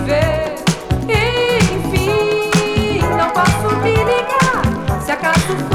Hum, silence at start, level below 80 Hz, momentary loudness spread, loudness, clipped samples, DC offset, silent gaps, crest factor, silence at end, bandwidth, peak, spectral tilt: none; 0 s; -28 dBFS; 4 LU; -15 LUFS; under 0.1%; under 0.1%; none; 10 dB; 0 s; 17 kHz; -6 dBFS; -5 dB/octave